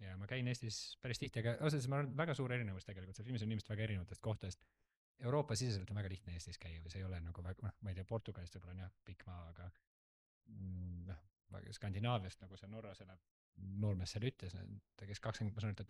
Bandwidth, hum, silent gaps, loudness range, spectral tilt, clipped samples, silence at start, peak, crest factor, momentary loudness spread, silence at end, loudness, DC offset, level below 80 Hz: 12.5 kHz; none; 4.97-5.15 s, 9.87-10.41 s, 13.31-13.53 s; 9 LU; -6 dB/octave; under 0.1%; 0 s; -24 dBFS; 20 dB; 16 LU; 0.05 s; -45 LUFS; under 0.1%; -64 dBFS